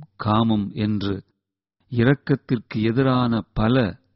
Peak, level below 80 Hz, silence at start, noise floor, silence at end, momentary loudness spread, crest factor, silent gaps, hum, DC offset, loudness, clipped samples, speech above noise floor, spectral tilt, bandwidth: -6 dBFS; -44 dBFS; 0 s; -76 dBFS; 0.2 s; 7 LU; 16 dB; none; none; under 0.1%; -22 LUFS; under 0.1%; 55 dB; -6.5 dB/octave; 5.8 kHz